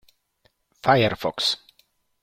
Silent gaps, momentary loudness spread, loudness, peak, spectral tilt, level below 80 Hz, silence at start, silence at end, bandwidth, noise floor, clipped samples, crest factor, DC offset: none; 8 LU; -22 LUFS; -4 dBFS; -4.5 dB/octave; -58 dBFS; 0.85 s; 0.65 s; 16 kHz; -67 dBFS; under 0.1%; 22 dB; under 0.1%